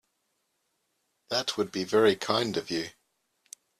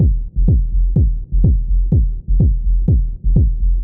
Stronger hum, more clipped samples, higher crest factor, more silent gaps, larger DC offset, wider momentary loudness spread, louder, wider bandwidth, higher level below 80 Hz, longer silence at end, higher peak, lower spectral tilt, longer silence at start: neither; neither; first, 22 dB vs 12 dB; neither; neither; first, 10 LU vs 2 LU; second, -28 LUFS vs -17 LUFS; first, 14.5 kHz vs 0.9 kHz; second, -68 dBFS vs -14 dBFS; first, 0.9 s vs 0 s; second, -10 dBFS vs -2 dBFS; second, -4 dB/octave vs -15.5 dB/octave; first, 1.3 s vs 0 s